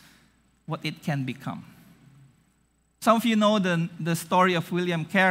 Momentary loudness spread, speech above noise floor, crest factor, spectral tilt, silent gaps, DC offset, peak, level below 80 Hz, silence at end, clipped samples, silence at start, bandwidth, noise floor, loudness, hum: 13 LU; 43 dB; 20 dB; -5.5 dB/octave; none; under 0.1%; -6 dBFS; -70 dBFS; 0 s; under 0.1%; 0.7 s; 16 kHz; -67 dBFS; -25 LUFS; none